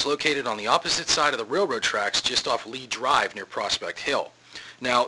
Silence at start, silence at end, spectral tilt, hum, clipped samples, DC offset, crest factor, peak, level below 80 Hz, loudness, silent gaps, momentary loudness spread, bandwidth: 0 s; 0 s; -1.5 dB/octave; none; under 0.1%; under 0.1%; 22 dB; -4 dBFS; -58 dBFS; -24 LUFS; none; 9 LU; 11.5 kHz